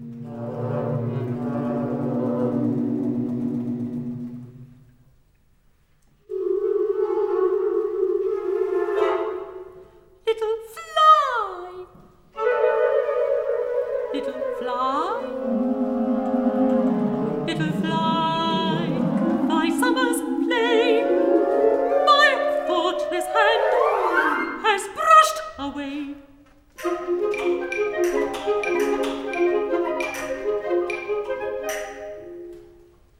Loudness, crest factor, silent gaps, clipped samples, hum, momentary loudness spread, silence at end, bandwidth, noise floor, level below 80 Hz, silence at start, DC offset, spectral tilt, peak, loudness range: -22 LUFS; 20 dB; none; under 0.1%; none; 13 LU; 0.55 s; 16.5 kHz; -59 dBFS; -56 dBFS; 0 s; under 0.1%; -5.5 dB/octave; -2 dBFS; 8 LU